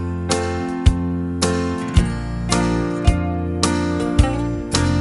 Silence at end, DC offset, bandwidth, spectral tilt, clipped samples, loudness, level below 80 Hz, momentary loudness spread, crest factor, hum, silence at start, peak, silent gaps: 0 s; under 0.1%; 11.5 kHz; -5.5 dB/octave; under 0.1%; -20 LUFS; -26 dBFS; 5 LU; 18 dB; none; 0 s; -2 dBFS; none